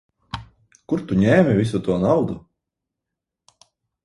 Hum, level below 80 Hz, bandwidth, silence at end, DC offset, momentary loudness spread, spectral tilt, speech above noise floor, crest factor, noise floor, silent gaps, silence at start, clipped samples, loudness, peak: none; -48 dBFS; 11.5 kHz; 1.65 s; under 0.1%; 20 LU; -8 dB/octave; 66 dB; 20 dB; -84 dBFS; none; 0.35 s; under 0.1%; -19 LUFS; -2 dBFS